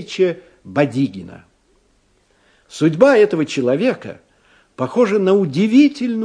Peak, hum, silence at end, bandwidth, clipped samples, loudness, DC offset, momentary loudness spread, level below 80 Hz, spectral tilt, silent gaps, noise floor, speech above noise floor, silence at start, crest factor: 0 dBFS; none; 0 s; 10.5 kHz; under 0.1%; -16 LUFS; under 0.1%; 16 LU; -60 dBFS; -6.5 dB/octave; none; -59 dBFS; 43 dB; 0 s; 18 dB